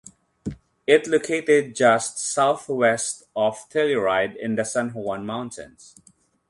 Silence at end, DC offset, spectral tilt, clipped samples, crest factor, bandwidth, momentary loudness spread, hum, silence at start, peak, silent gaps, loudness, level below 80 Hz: 0.8 s; under 0.1%; -3.5 dB/octave; under 0.1%; 20 dB; 11.5 kHz; 15 LU; none; 0.45 s; -2 dBFS; none; -22 LUFS; -58 dBFS